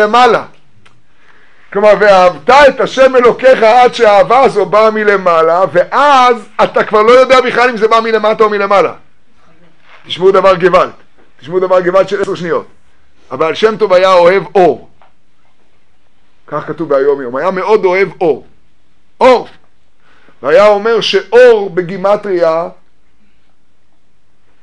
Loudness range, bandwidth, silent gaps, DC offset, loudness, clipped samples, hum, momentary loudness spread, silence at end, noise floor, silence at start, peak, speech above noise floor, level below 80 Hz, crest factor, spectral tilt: 7 LU; 10.5 kHz; none; 2%; -9 LUFS; 2%; none; 11 LU; 1.9 s; -58 dBFS; 0 s; 0 dBFS; 50 dB; -46 dBFS; 10 dB; -5 dB/octave